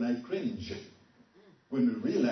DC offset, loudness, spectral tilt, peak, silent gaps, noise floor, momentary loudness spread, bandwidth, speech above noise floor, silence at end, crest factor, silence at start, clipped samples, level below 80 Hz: under 0.1%; -33 LUFS; -6.5 dB/octave; -18 dBFS; none; -61 dBFS; 14 LU; 6.4 kHz; 30 dB; 0 s; 14 dB; 0 s; under 0.1%; -66 dBFS